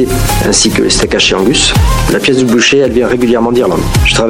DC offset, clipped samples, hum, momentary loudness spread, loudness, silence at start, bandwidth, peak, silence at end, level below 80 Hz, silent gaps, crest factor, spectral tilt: under 0.1%; under 0.1%; none; 3 LU; -9 LUFS; 0 s; 17.5 kHz; 0 dBFS; 0 s; -18 dBFS; none; 8 dB; -4 dB/octave